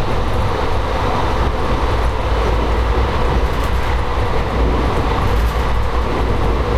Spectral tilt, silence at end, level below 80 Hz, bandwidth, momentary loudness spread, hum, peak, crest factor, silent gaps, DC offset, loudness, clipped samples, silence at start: -6.5 dB/octave; 0 s; -18 dBFS; 13.5 kHz; 2 LU; none; -4 dBFS; 12 dB; none; under 0.1%; -18 LUFS; under 0.1%; 0 s